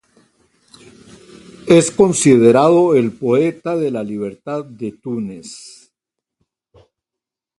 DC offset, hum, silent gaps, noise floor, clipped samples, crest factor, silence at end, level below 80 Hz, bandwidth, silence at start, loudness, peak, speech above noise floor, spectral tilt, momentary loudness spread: under 0.1%; none; none; -85 dBFS; under 0.1%; 18 dB; 1.9 s; -56 dBFS; 11.5 kHz; 1.65 s; -15 LUFS; 0 dBFS; 71 dB; -5.5 dB/octave; 18 LU